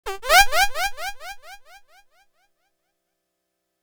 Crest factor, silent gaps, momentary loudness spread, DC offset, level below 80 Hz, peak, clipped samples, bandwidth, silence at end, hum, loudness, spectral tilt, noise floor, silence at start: 24 dB; none; 23 LU; under 0.1%; -40 dBFS; 0 dBFS; under 0.1%; over 20 kHz; 2.3 s; none; -18 LUFS; 0.5 dB/octave; -77 dBFS; 0.05 s